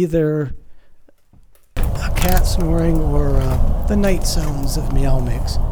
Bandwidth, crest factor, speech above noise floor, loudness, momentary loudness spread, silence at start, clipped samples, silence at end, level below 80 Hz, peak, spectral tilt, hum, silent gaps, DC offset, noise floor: over 20 kHz; 14 dB; 31 dB; -20 LUFS; 6 LU; 0 s; under 0.1%; 0 s; -18 dBFS; -2 dBFS; -6 dB/octave; none; none; under 0.1%; -46 dBFS